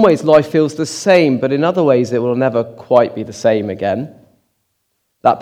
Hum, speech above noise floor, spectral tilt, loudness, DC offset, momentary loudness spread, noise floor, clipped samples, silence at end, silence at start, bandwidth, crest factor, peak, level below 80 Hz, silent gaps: none; 54 dB; -6 dB/octave; -15 LUFS; under 0.1%; 8 LU; -68 dBFS; 0.1%; 0 s; 0 s; 13.5 kHz; 14 dB; 0 dBFS; -58 dBFS; none